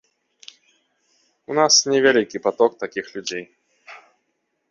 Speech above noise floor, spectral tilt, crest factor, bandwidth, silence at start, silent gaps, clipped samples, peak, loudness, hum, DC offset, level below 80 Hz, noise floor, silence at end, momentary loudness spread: 54 dB; -1.5 dB/octave; 22 dB; 7.4 kHz; 1.5 s; none; under 0.1%; -2 dBFS; -19 LUFS; none; under 0.1%; -68 dBFS; -73 dBFS; 0.75 s; 15 LU